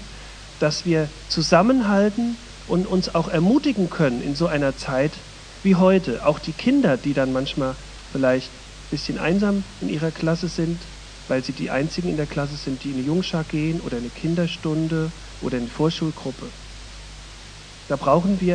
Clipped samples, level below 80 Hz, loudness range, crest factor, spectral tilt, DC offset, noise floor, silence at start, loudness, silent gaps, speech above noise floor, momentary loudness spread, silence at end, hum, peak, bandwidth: under 0.1%; -42 dBFS; 5 LU; 20 dB; -6 dB/octave; under 0.1%; -41 dBFS; 0 s; -22 LUFS; none; 19 dB; 20 LU; 0 s; none; -2 dBFS; 10 kHz